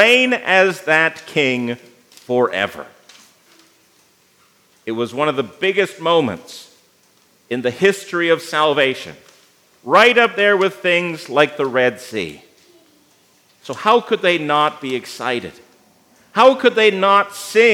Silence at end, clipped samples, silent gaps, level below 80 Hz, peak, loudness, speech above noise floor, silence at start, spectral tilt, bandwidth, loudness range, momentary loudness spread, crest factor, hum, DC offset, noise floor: 0 s; under 0.1%; none; -72 dBFS; 0 dBFS; -16 LUFS; 39 dB; 0 s; -4 dB/octave; 16.5 kHz; 8 LU; 15 LU; 18 dB; none; under 0.1%; -56 dBFS